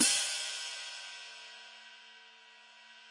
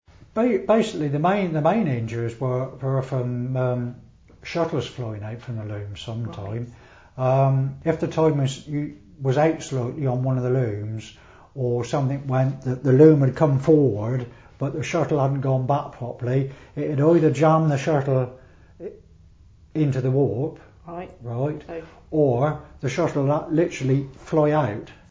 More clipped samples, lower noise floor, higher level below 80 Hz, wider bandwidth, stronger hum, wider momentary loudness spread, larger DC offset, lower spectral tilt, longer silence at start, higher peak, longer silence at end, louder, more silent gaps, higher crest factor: neither; first, -57 dBFS vs -50 dBFS; second, under -90 dBFS vs -52 dBFS; first, 11.5 kHz vs 8 kHz; neither; first, 23 LU vs 15 LU; neither; second, 2 dB/octave vs -8 dB/octave; second, 0 s vs 0.35 s; second, -12 dBFS vs -4 dBFS; second, 0 s vs 0.15 s; second, -34 LUFS vs -23 LUFS; neither; first, 26 dB vs 20 dB